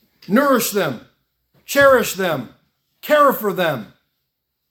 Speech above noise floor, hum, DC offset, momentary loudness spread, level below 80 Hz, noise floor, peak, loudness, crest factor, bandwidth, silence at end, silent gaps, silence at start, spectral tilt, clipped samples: 58 dB; none; under 0.1%; 16 LU; -58 dBFS; -75 dBFS; 0 dBFS; -17 LUFS; 18 dB; 18 kHz; 0.85 s; none; 0.3 s; -4 dB/octave; under 0.1%